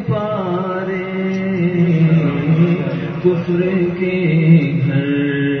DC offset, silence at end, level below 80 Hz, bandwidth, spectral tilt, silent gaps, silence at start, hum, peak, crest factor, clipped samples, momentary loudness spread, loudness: under 0.1%; 0 s; -50 dBFS; 5.8 kHz; -10 dB/octave; none; 0 s; none; -2 dBFS; 14 dB; under 0.1%; 8 LU; -16 LUFS